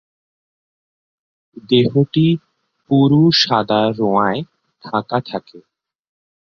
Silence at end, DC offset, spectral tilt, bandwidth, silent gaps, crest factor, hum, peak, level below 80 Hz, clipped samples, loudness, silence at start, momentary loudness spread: 0.9 s; under 0.1%; -6.5 dB/octave; 6.8 kHz; none; 16 dB; none; -2 dBFS; -56 dBFS; under 0.1%; -16 LUFS; 1.7 s; 13 LU